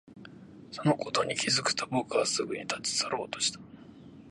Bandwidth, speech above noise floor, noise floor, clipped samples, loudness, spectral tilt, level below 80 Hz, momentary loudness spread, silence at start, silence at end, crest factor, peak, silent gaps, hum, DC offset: 11.5 kHz; 20 dB; -50 dBFS; under 0.1%; -29 LUFS; -3 dB/octave; -68 dBFS; 22 LU; 0.1 s; 0 s; 22 dB; -10 dBFS; none; none; under 0.1%